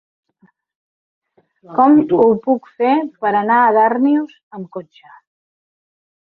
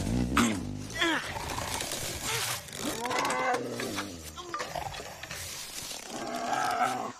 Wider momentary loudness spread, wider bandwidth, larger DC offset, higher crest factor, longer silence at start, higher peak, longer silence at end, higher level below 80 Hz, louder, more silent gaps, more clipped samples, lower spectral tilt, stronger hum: first, 19 LU vs 10 LU; second, 4.4 kHz vs 15.5 kHz; neither; second, 16 dB vs 22 dB; first, 1.7 s vs 0 s; first, -2 dBFS vs -10 dBFS; first, 1.4 s vs 0 s; second, -64 dBFS vs -48 dBFS; first, -14 LUFS vs -32 LUFS; first, 4.43-4.51 s vs none; neither; first, -9.5 dB/octave vs -3 dB/octave; neither